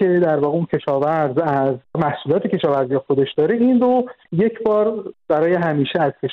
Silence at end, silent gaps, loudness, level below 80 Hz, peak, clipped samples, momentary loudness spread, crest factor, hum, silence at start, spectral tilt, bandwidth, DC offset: 0 s; none; -18 LUFS; -58 dBFS; -6 dBFS; under 0.1%; 6 LU; 12 dB; none; 0 s; -9.5 dB/octave; 5.4 kHz; under 0.1%